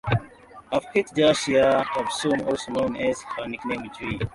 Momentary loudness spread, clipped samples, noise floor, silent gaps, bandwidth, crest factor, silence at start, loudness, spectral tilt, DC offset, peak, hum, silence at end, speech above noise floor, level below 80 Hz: 11 LU; under 0.1%; -47 dBFS; none; 11.5 kHz; 18 dB; 0.05 s; -24 LUFS; -5 dB/octave; under 0.1%; -6 dBFS; none; 0.05 s; 23 dB; -50 dBFS